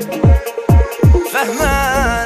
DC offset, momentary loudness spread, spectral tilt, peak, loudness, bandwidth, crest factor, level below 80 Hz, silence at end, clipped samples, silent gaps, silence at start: under 0.1%; 3 LU; -6 dB/octave; 0 dBFS; -14 LUFS; 15.5 kHz; 12 dB; -18 dBFS; 0 s; under 0.1%; none; 0 s